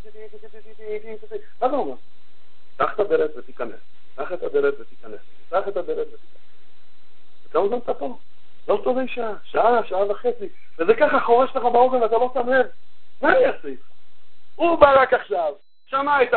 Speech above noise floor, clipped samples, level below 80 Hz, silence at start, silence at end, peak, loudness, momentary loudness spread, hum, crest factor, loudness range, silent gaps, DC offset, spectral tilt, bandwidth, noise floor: 42 dB; under 0.1%; -54 dBFS; 0.05 s; 0 s; 0 dBFS; -21 LUFS; 18 LU; none; 22 dB; 8 LU; none; 5%; -9.5 dB/octave; 4.5 kHz; -62 dBFS